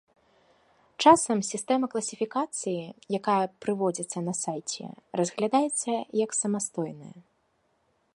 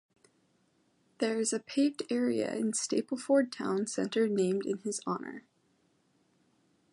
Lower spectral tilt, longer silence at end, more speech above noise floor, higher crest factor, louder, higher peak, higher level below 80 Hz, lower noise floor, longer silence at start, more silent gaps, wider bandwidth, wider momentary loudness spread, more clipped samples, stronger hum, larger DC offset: about the same, -4 dB/octave vs -4.5 dB/octave; second, 0.95 s vs 1.55 s; about the same, 44 dB vs 41 dB; about the same, 22 dB vs 18 dB; first, -27 LUFS vs -32 LUFS; first, -6 dBFS vs -16 dBFS; first, -72 dBFS vs -82 dBFS; about the same, -71 dBFS vs -72 dBFS; second, 1 s vs 1.2 s; neither; about the same, 11.5 kHz vs 11.5 kHz; first, 13 LU vs 7 LU; neither; neither; neither